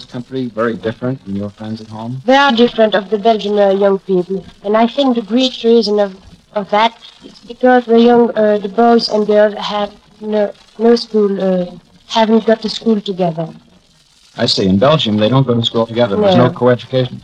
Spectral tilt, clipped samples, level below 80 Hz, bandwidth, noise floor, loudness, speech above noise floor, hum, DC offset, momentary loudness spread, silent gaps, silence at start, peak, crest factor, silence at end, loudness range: -6.5 dB/octave; under 0.1%; -52 dBFS; 9.4 kHz; -49 dBFS; -13 LUFS; 36 dB; none; under 0.1%; 12 LU; none; 0 s; 0 dBFS; 14 dB; 0.05 s; 3 LU